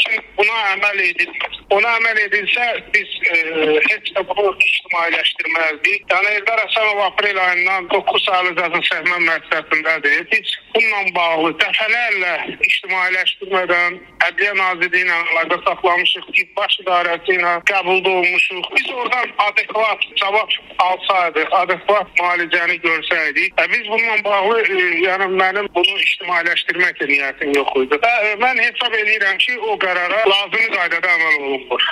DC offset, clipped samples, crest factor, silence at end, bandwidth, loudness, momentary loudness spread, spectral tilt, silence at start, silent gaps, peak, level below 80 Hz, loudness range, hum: under 0.1%; under 0.1%; 16 dB; 0 s; 13 kHz; -15 LUFS; 3 LU; -2.5 dB/octave; 0 s; none; 0 dBFS; -58 dBFS; 1 LU; none